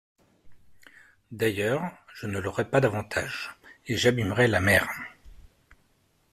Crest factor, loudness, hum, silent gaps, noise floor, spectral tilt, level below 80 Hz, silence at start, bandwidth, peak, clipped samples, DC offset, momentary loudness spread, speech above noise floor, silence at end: 22 dB; -26 LUFS; none; none; -67 dBFS; -5 dB/octave; -56 dBFS; 0.45 s; 15.5 kHz; -8 dBFS; under 0.1%; under 0.1%; 17 LU; 41 dB; 0.95 s